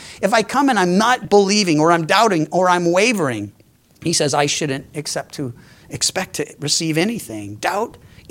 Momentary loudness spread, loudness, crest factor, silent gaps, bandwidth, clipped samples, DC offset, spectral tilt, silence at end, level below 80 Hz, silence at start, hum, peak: 14 LU; -17 LUFS; 18 dB; none; 17 kHz; under 0.1%; under 0.1%; -3.5 dB/octave; 0.4 s; -56 dBFS; 0 s; none; 0 dBFS